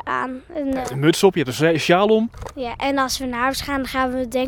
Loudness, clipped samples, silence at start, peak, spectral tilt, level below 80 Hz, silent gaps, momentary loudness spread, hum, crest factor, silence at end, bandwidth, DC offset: -20 LUFS; under 0.1%; 0.05 s; 0 dBFS; -5 dB/octave; -44 dBFS; none; 11 LU; none; 20 dB; 0 s; 19.5 kHz; under 0.1%